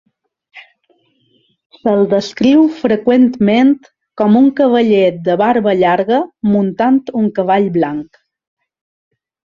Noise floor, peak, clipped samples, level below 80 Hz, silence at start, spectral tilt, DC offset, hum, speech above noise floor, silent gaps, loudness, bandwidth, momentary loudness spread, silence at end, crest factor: -58 dBFS; 0 dBFS; under 0.1%; -56 dBFS; 0.55 s; -7.5 dB/octave; under 0.1%; none; 46 dB; 1.66-1.70 s; -13 LUFS; 7.2 kHz; 6 LU; 1.55 s; 14 dB